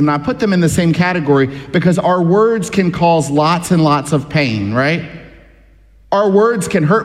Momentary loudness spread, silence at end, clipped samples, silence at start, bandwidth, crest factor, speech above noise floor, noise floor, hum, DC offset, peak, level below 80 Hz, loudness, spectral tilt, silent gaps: 4 LU; 0 s; under 0.1%; 0 s; 14 kHz; 14 dB; 32 dB; -45 dBFS; none; under 0.1%; 0 dBFS; -44 dBFS; -14 LUFS; -6 dB/octave; none